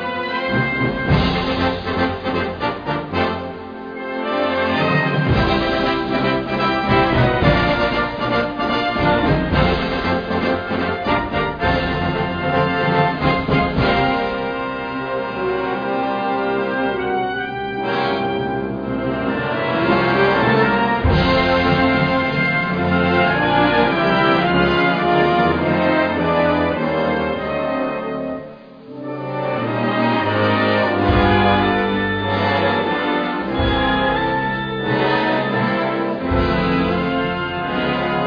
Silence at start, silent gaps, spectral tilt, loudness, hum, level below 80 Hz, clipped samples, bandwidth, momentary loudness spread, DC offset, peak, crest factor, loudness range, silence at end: 0 s; none; -8 dB/octave; -18 LUFS; none; -34 dBFS; under 0.1%; 5.2 kHz; 7 LU; under 0.1%; -2 dBFS; 16 dB; 5 LU; 0 s